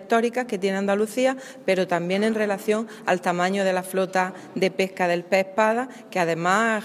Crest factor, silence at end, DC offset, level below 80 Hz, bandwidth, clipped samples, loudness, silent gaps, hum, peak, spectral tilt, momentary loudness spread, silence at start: 18 dB; 0 s; under 0.1%; -76 dBFS; 16 kHz; under 0.1%; -23 LUFS; none; none; -6 dBFS; -5 dB/octave; 5 LU; 0 s